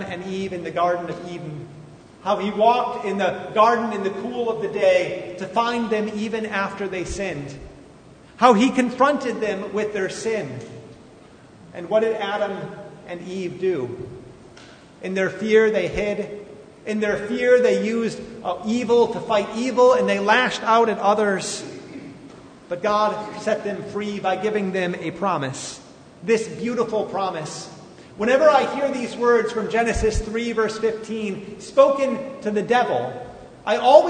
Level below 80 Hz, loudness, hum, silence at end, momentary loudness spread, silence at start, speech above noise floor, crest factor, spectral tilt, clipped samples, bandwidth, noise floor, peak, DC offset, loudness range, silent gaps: -44 dBFS; -21 LUFS; none; 0 s; 17 LU; 0 s; 26 dB; 22 dB; -5 dB/octave; under 0.1%; 9.6 kHz; -46 dBFS; 0 dBFS; under 0.1%; 6 LU; none